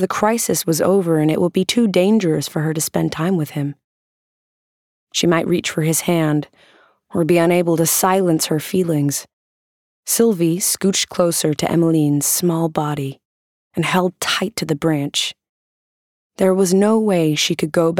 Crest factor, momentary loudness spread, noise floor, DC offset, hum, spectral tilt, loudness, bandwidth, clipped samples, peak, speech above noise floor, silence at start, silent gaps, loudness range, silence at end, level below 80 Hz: 16 dB; 8 LU; under -90 dBFS; under 0.1%; none; -4.5 dB/octave; -17 LUFS; 19 kHz; under 0.1%; -2 dBFS; over 73 dB; 0 s; 3.84-5.07 s, 9.33-10.03 s, 13.25-13.71 s, 15.49-16.30 s; 4 LU; 0 s; -58 dBFS